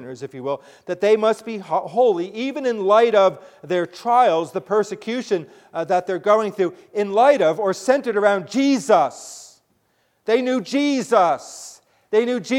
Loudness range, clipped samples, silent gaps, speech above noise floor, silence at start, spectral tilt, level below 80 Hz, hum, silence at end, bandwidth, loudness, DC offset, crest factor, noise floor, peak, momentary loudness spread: 2 LU; under 0.1%; none; 46 dB; 0 s; -4.5 dB/octave; -72 dBFS; none; 0 s; 14.5 kHz; -20 LUFS; under 0.1%; 18 dB; -66 dBFS; -2 dBFS; 14 LU